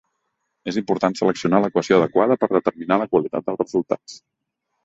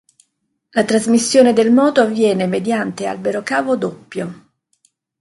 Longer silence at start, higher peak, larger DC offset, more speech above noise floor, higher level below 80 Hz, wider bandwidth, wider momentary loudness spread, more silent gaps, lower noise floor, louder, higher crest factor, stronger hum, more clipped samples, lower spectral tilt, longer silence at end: about the same, 0.65 s vs 0.75 s; about the same, -2 dBFS vs 0 dBFS; neither; about the same, 57 dB vs 55 dB; about the same, -62 dBFS vs -62 dBFS; second, 8 kHz vs 11.5 kHz; second, 9 LU vs 13 LU; neither; first, -77 dBFS vs -70 dBFS; second, -20 LUFS vs -16 LUFS; about the same, 18 dB vs 16 dB; neither; neither; first, -6.5 dB/octave vs -4.5 dB/octave; second, 0.7 s vs 0.85 s